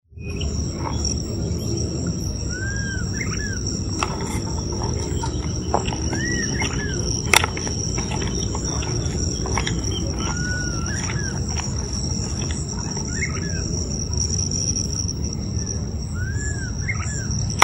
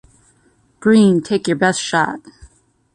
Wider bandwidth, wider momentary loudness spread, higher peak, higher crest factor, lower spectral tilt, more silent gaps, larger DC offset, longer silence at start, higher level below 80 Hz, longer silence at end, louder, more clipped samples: first, 16 kHz vs 10.5 kHz; second, 5 LU vs 9 LU; about the same, 0 dBFS vs -2 dBFS; first, 24 dB vs 16 dB; second, -3.5 dB/octave vs -5 dB/octave; neither; neither; second, 0.1 s vs 0.8 s; first, -30 dBFS vs -54 dBFS; second, 0 s vs 0.75 s; second, -24 LUFS vs -16 LUFS; neither